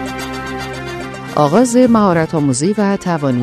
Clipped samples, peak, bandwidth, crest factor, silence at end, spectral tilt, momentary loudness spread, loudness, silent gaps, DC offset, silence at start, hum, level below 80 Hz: under 0.1%; 0 dBFS; 13.5 kHz; 14 dB; 0 s; -6 dB/octave; 13 LU; -15 LUFS; none; under 0.1%; 0 s; none; -42 dBFS